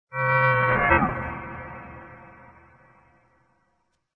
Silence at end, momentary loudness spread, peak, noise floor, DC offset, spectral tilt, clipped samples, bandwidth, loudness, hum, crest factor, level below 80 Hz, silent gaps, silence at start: 1.85 s; 23 LU; -2 dBFS; -72 dBFS; under 0.1%; -9 dB/octave; under 0.1%; 5 kHz; -22 LUFS; none; 24 dB; -46 dBFS; none; 0.1 s